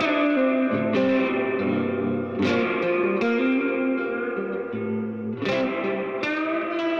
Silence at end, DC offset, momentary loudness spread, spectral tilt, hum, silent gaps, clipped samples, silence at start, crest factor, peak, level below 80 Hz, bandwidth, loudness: 0 s; under 0.1%; 7 LU; -7 dB/octave; none; none; under 0.1%; 0 s; 12 dB; -10 dBFS; -64 dBFS; 7.2 kHz; -24 LUFS